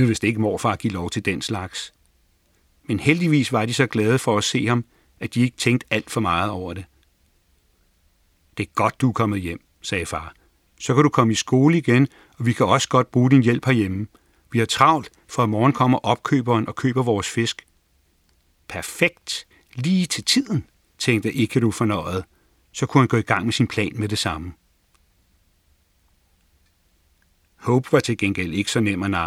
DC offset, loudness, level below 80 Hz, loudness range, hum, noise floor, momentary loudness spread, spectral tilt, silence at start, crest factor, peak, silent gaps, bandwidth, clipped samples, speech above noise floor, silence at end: under 0.1%; -21 LUFS; -56 dBFS; 7 LU; none; -63 dBFS; 14 LU; -5.5 dB/octave; 0 s; 22 dB; 0 dBFS; none; 15 kHz; under 0.1%; 42 dB; 0 s